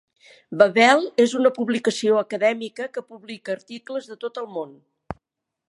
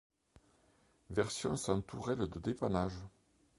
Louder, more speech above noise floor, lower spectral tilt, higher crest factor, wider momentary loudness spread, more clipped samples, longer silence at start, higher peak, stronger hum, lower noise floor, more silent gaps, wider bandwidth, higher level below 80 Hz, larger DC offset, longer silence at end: first, -21 LUFS vs -38 LUFS; first, 54 dB vs 34 dB; second, -4 dB/octave vs -5.5 dB/octave; about the same, 22 dB vs 22 dB; first, 22 LU vs 5 LU; neither; second, 0.5 s vs 1.1 s; first, -2 dBFS vs -18 dBFS; neither; first, -75 dBFS vs -71 dBFS; neither; about the same, 11.5 kHz vs 11.5 kHz; about the same, -60 dBFS vs -58 dBFS; neither; about the same, 0.6 s vs 0.5 s